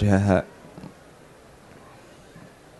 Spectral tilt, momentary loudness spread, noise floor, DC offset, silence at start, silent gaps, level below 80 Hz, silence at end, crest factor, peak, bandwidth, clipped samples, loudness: -8 dB/octave; 28 LU; -49 dBFS; under 0.1%; 0 s; none; -50 dBFS; 2 s; 22 dB; -6 dBFS; 12 kHz; under 0.1%; -21 LUFS